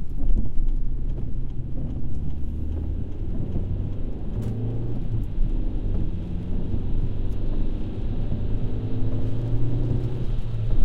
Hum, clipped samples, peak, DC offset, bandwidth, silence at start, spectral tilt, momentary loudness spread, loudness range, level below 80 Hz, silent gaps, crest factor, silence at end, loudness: none; under 0.1%; -6 dBFS; under 0.1%; 4 kHz; 0 s; -10 dB/octave; 5 LU; 3 LU; -26 dBFS; none; 16 dB; 0 s; -30 LUFS